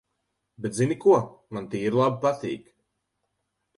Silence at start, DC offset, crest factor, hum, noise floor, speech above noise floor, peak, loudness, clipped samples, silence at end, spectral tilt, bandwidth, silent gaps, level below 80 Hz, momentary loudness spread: 0.6 s; under 0.1%; 20 dB; none; -78 dBFS; 54 dB; -8 dBFS; -25 LUFS; under 0.1%; 1.2 s; -6.5 dB/octave; 11.5 kHz; none; -64 dBFS; 15 LU